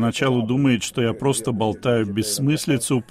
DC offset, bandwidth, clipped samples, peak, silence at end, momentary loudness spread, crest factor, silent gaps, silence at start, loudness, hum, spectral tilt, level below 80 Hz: under 0.1%; 16 kHz; under 0.1%; -6 dBFS; 0.1 s; 3 LU; 14 dB; none; 0 s; -21 LUFS; none; -5 dB/octave; -54 dBFS